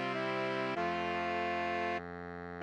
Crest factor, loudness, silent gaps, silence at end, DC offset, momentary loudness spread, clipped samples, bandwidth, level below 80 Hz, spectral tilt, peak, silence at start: 14 dB; -36 LUFS; none; 0 s; under 0.1%; 9 LU; under 0.1%; 10 kHz; -66 dBFS; -5.5 dB/octave; -22 dBFS; 0 s